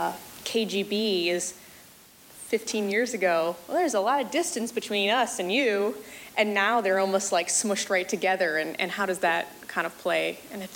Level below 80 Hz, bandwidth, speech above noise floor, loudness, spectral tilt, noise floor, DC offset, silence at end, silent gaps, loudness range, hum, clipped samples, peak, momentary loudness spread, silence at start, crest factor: -70 dBFS; 17 kHz; 26 dB; -26 LUFS; -2.5 dB/octave; -52 dBFS; under 0.1%; 0 s; none; 3 LU; none; under 0.1%; -10 dBFS; 7 LU; 0 s; 18 dB